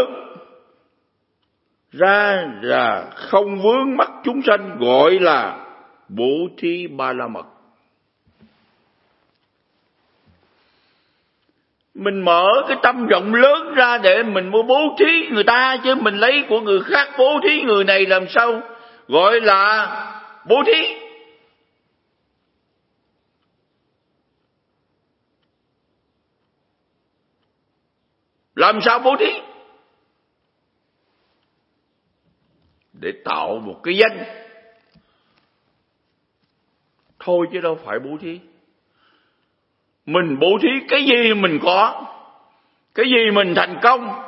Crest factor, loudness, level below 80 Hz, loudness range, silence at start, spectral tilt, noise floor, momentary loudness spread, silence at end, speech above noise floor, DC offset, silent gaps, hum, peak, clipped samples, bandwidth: 20 dB; -16 LUFS; -72 dBFS; 12 LU; 0 s; -7 dB/octave; -70 dBFS; 16 LU; 0 s; 54 dB; under 0.1%; none; none; 0 dBFS; under 0.1%; 5.8 kHz